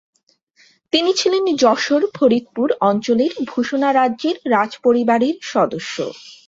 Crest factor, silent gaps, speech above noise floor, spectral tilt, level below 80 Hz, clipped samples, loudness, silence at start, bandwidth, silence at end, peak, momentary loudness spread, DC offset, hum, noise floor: 16 dB; none; 40 dB; -4 dB/octave; -64 dBFS; under 0.1%; -17 LUFS; 0.95 s; 8 kHz; 0.15 s; -2 dBFS; 6 LU; under 0.1%; none; -57 dBFS